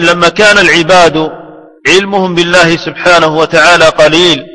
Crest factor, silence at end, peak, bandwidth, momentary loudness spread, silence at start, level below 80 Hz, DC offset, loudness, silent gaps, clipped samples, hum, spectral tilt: 6 dB; 0.05 s; 0 dBFS; 11 kHz; 6 LU; 0 s; -36 dBFS; 0.8%; -6 LUFS; none; 4%; none; -3.5 dB/octave